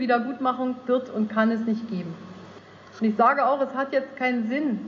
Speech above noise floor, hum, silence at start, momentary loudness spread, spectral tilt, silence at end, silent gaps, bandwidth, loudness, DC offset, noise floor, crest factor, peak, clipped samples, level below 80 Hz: 22 dB; none; 0 s; 13 LU; -7.5 dB/octave; 0 s; none; 6.8 kHz; -24 LUFS; under 0.1%; -46 dBFS; 18 dB; -8 dBFS; under 0.1%; -74 dBFS